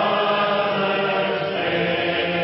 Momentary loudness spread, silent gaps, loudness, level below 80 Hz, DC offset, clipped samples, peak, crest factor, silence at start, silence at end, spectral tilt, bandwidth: 3 LU; none; -21 LUFS; -56 dBFS; under 0.1%; under 0.1%; -10 dBFS; 12 dB; 0 s; 0 s; -9.5 dB/octave; 5.8 kHz